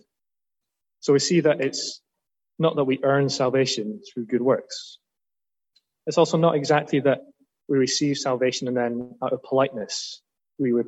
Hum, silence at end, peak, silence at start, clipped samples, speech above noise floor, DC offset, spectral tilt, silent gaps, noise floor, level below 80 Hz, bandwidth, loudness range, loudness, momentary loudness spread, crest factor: none; 0 s; -6 dBFS; 1.05 s; under 0.1%; over 67 dB; under 0.1%; -5 dB/octave; none; under -90 dBFS; -72 dBFS; 8.6 kHz; 2 LU; -23 LUFS; 13 LU; 18 dB